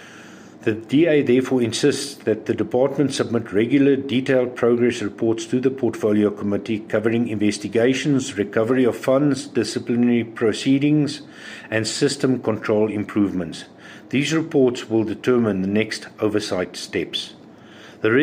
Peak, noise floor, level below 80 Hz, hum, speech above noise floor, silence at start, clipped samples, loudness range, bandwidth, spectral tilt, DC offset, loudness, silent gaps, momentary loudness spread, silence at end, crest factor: -4 dBFS; -43 dBFS; -64 dBFS; none; 23 dB; 0 s; under 0.1%; 2 LU; 15.5 kHz; -5.5 dB/octave; under 0.1%; -21 LUFS; none; 8 LU; 0 s; 16 dB